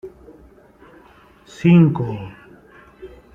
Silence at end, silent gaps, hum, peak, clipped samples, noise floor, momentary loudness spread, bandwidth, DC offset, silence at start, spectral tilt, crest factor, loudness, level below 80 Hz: 0.25 s; none; none; -2 dBFS; under 0.1%; -49 dBFS; 25 LU; 7.2 kHz; under 0.1%; 0.05 s; -9 dB/octave; 18 dB; -16 LUFS; -52 dBFS